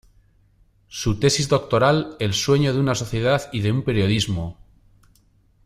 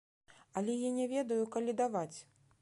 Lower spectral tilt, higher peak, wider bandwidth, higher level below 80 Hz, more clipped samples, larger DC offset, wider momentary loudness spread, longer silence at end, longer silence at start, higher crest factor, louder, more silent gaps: about the same, -5 dB/octave vs -5.5 dB/octave; first, -4 dBFS vs -22 dBFS; first, 15.5 kHz vs 11.5 kHz; first, -44 dBFS vs -82 dBFS; neither; neither; about the same, 8 LU vs 9 LU; first, 1.15 s vs 0.4 s; first, 0.9 s vs 0.55 s; about the same, 18 dB vs 16 dB; first, -21 LUFS vs -36 LUFS; neither